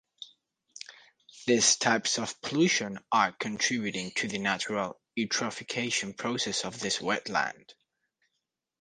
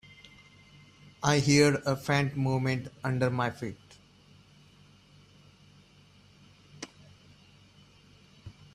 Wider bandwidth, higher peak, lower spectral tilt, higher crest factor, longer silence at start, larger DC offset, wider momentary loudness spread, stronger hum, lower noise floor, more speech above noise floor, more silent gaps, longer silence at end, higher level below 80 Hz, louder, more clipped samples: second, 11 kHz vs 14 kHz; about the same, -8 dBFS vs -10 dBFS; second, -2.5 dB/octave vs -5 dB/octave; about the same, 22 dB vs 22 dB; second, 0.2 s vs 1.2 s; neither; second, 13 LU vs 29 LU; neither; first, -84 dBFS vs -59 dBFS; first, 55 dB vs 31 dB; neither; first, 1.1 s vs 0.25 s; second, -70 dBFS vs -62 dBFS; about the same, -29 LUFS vs -28 LUFS; neither